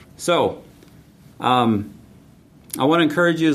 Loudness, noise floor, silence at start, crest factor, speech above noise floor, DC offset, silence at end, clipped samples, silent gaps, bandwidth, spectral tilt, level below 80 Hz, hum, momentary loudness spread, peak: -19 LUFS; -49 dBFS; 0.2 s; 18 dB; 31 dB; under 0.1%; 0 s; under 0.1%; none; 14.5 kHz; -5 dB/octave; -58 dBFS; none; 16 LU; -2 dBFS